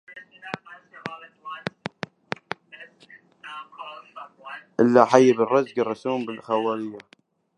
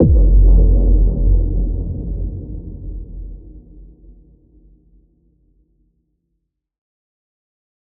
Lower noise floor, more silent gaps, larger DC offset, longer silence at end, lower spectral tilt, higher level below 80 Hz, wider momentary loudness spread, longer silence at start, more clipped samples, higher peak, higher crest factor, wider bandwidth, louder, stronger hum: second, -53 dBFS vs -73 dBFS; neither; neither; second, 0.6 s vs 4.2 s; second, -6 dB/octave vs -17 dB/octave; second, -72 dBFS vs -18 dBFS; first, 25 LU vs 21 LU; about the same, 0.1 s vs 0 s; neither; about the same, 0 dBFS vs -2 dBFS; first, 24 dB vs 16 dB; first, 9.8 kHz vs 1 kHz; second, -22 LUFS vs -17 LUFS; neither